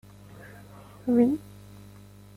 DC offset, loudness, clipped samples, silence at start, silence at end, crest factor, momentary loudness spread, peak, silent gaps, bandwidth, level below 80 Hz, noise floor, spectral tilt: under 0.1%; -26 LUFS; under 0.1%; 0.4 s; 0.95 s; 18 dB; 26 LU; -12 dBFS; none; 14.5 kHz; -60 dBFS; -49 dBFS; -8 dB/octave